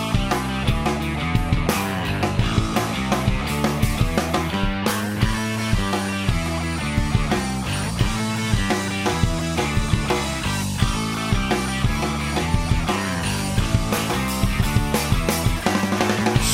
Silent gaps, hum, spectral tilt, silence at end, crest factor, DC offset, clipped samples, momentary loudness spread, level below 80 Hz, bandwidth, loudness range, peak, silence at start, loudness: none; none; -5 dB/octave; 0 s; 18 dB; 0.1%; under 0.1%; 2 LU; -28 dBFS; 16 kHz; 1 LU; -4 dBFS; 0 s; -22 LUFS